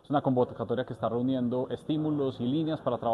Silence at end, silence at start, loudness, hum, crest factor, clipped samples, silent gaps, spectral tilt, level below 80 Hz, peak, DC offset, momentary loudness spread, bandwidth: 0 s; 0.1 s; -30 LUFS; none; 16 dB; under 0.1%; none; -9 dB/octave; -64 dBFS; -12 dBFS; under 0.1%; 4 LU; 10 kHz